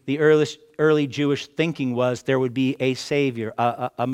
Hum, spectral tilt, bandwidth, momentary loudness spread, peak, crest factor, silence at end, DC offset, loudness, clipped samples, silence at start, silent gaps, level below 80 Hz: none; -6 dB/octave; 12 kHz; 6 LU; -4 dBFS; 16 dB; 0 s; under 0.1%; -22 LUFS; under 0.1%; 0.05 s; none; -66 dBFS